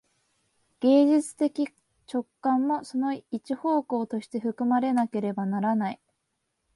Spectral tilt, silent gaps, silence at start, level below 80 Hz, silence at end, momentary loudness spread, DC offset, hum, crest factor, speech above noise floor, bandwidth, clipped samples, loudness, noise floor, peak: -6.5 dB/octave; none; 0.8 s; -76 dBFS; 0.8 s; 12 LU; under 0.1%; none; 16 dB; 53 dB; 11.5 kHz; under 0.1%; -27 LUFS; -78 dBFS; -10 dBFS